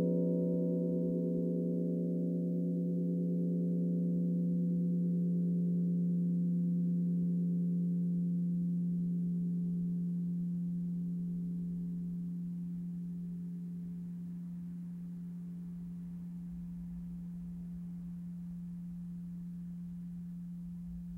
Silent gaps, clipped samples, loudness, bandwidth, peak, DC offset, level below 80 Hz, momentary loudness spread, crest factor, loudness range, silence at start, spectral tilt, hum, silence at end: none; under 0.1%; -36 LUFS; 1 kHz; -22 dBFS; under 0.1%; -64 dBFS; 11 LU; 14 dB; 11 LU; 0 s; -12.5 dB/octave; none; 0 s